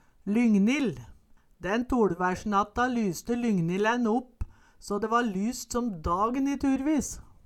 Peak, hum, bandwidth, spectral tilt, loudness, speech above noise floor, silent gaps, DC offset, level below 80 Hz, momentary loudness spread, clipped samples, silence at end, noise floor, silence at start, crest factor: -12 dBFS; none; 14 kHz; -5.5 dB/octave; -27 LUFS; 30 dB; none; under 0.1%; -48 dBFS; 11 LU; under 0.1%; 0.25 s; -56 dBFS; 0.25 s; 16 dB